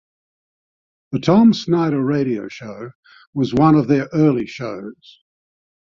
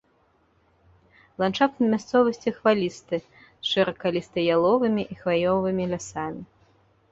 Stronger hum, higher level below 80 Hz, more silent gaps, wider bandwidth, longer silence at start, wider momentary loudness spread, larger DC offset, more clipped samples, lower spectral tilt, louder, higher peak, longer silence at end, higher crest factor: neither; first, -54 dBFS vs -60 dBFS; first, 2.95-3.03 s, 3.27-3.33 s vs none; about the same, 7.4 kHz vs 8 kHz; second, 1.1 s vs 1.4 s; first, 19 LU vs 10 LU; neither; neither; first, -8 dB/octave vs -5.5 dB/octave; first, -17 LUFS vs -24 LUFS; first, -2 dBFS vs -6 dBFS; first, 1.05 s vs 0.65 s; about the same, 18 dB vs 18 dB